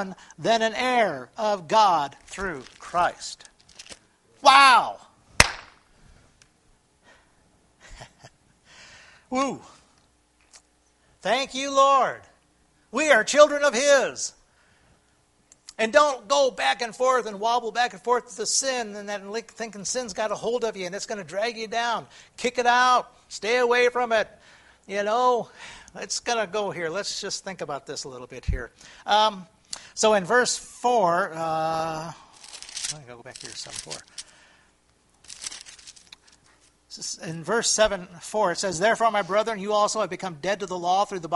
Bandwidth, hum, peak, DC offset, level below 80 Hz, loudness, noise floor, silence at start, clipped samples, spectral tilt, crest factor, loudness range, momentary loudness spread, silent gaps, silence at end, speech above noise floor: 11.5 kHz; none; 0 dBFS; under 0.1%; -50 dBFS; -23 LUFS; -64 dBFS; 0 s; under 0.1%; -2 dB/octave; 26 dB; 15 LU; 19 LU; none; 0 s; 40 dB